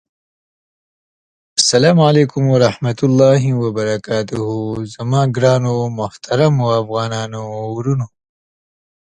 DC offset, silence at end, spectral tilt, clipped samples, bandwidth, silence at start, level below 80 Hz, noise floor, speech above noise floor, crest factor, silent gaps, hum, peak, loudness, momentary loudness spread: under 0.1%; 1.1 s; -5.5 dB/octave; under 0.1%; 10 kHz; 1.55 s; -52 dBFS; under -90 dBFS; over 75 dB; 16 dB; none; none; 0 dBFS; -15 LUFS; 12 LU